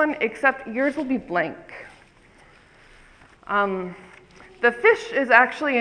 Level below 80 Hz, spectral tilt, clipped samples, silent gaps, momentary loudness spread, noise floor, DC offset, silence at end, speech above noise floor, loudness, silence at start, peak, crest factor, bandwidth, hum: -58 dBFS; -5.5 dB/octave; under 0.1%; none; 17 LU; -53 dBFS; under 0.1%; 0 s; 31 dB; -21 LUFS; 0 s; 0 dBFS; 24 dB; 10.5 kHz; none